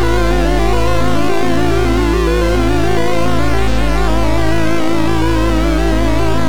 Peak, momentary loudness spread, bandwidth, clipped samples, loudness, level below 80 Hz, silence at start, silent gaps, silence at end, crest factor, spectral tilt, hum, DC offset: -6 dBFS; 2 LU; 17 kHz; under 0.1%; -15 LUFS; -18 dBFS; 0 s; none; 0 s; 8 dB; -6 dB/octave; none; 20%